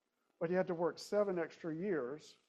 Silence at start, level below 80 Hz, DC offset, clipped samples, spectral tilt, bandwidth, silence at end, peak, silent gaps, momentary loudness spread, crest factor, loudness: 0.4 s; -82 dBFS; under 0.1%; under 0.1%; -6.5 dB/octave; 13 kHz; 0.15 s; -22 dBFS; none; 7 LU; 16 dB; -38 LUFS